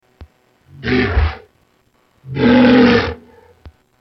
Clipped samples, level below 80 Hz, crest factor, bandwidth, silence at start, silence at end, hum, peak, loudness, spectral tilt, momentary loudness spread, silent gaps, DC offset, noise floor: under 0.1%; -28 dBFS; 16 dB; 6.2 kHz; 0.2 s; 0.3 s; none; 0 dBFS; -13 LUFS; -7.5 dB/octave; 19 LU; none; under 0.1%; -58 dBFS